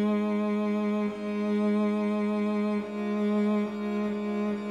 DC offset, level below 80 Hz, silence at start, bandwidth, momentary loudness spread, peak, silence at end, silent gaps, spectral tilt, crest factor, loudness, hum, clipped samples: under 0.1%; -68 dBFS; 0 s; 7.4 kHz; 4 LU; -18 dBFS; 0 s; none; -8 dB/octave; 10 dB; -28 LUFS; none; under 0.1%